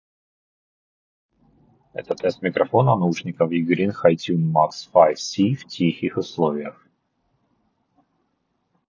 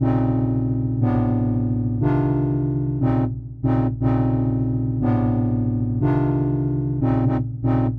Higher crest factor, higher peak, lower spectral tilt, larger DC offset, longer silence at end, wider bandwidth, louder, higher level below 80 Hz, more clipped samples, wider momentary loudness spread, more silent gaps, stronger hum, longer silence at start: first, 22 dB vs 10 dB; first, -2 dBFS vs -10 dBFS; second, -6.5 dB/octave vs -12 dB/octave; neither; first, 2.15 s vs 0 s; first, 7.4 kHz vs 3.6 kHz; about the same, -21 LUFS vs -21 LUFS; second, -64 dBFS vs -36 dBFS; neither; first, 9 LU vs 3 LU; neither; neither; first, 1.95 s vs 0 s